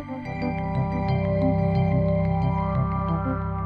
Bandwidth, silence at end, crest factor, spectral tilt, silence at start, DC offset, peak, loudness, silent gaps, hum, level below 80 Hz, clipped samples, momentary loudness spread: 5 kHz; 0 s; 12 dB; -10.5 dB/octave; 0 s; under 0.1%; -10 dBFS; -24 LUFS; none; none; -36 dBFS; under 0.1%; 6 LU